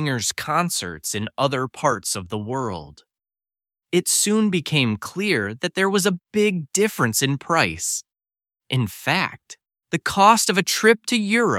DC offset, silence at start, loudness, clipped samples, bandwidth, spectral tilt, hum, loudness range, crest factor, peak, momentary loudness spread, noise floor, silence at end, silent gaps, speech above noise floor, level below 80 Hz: under 0.1%; 0 s; -21 LUFS; under 0.1%; 17 kHz; -3.5 dB/octave; none; 4 LU; 22 dB; 0 dBFS; 10 LU; under -90 dBFS; 0 s; none; over 69 dB; -58 dBFS